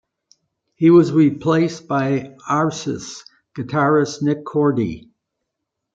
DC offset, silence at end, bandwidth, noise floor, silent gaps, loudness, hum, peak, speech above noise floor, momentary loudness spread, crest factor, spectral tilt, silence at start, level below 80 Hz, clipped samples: under 0.1%; 0.95 s; 7.8 kHz; -79 dBFS; none; -18 LUFS; none; -2 dBFS; 62 dB; 18 LU; 16 dB; -7 dB/octave; 0.8 s; -58 dBFS; under 0.1%